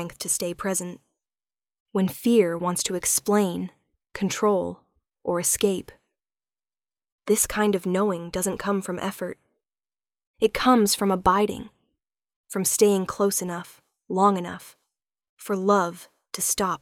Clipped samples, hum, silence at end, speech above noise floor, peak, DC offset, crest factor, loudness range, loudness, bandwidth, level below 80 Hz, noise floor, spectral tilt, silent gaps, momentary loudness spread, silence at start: under 0.1%; none; 0.05 s; over 66 dB; -6 dBFS; under 0.1%; 20 dB; 4 LU; -24 LUFS; 18 kHz; -54 dBFS; under -90 dBFS; -4 dB/octave; 1.80-1.86 s, 7.12-7.19 s, 10.27-10.34 s, 12.36-12.44 s, 15.29-15.37 s; 14 LU; 0 s